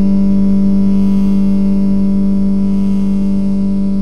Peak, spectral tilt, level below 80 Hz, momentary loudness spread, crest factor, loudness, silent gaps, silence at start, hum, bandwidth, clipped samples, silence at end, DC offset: -2 dBFS; -10 dB/octave; -30 dBFS; 3 LU; 8 dB; -13 LUFS; none; 0 s; 50 Hz at -35 dBFS; 5.6 kHz; under 0.1%; 0 s; 20%